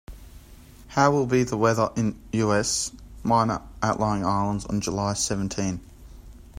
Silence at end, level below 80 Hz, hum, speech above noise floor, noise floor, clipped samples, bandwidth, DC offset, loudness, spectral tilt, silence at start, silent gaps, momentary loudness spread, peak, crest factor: 0 s; -46 dBFS; none; 23 dB; -47 dBFS; under 0.1%; 16 kHz; under 0.1%; -24 LUFS; -5 dB/octave; 0.1 s; none; 8 LU; -6 dBFS; 20 dB